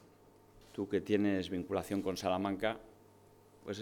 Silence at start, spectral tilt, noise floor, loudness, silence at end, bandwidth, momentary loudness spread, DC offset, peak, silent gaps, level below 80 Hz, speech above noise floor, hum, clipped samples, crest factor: 0.55 s; -6 dB/octave; -62 dBFS; -36 LUFS; 0 s; 18.5 kHz; 14 LU; under 0.1%; -18 dBFS; none; -68 dBFS; 27 dB; none; under 0.1%; 20 dB